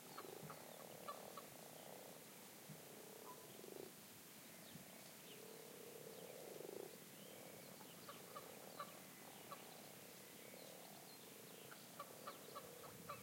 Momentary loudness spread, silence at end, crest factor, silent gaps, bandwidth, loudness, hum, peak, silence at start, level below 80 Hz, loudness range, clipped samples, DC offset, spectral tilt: 3 LU; 0 s; 20 dB; none; 16.5 kHz; -57 LUFS; none; -38 dBFS; 0 s; under -90 dBFS; 1 LU; under 0.1%; under 0.1%; -3 dB/octave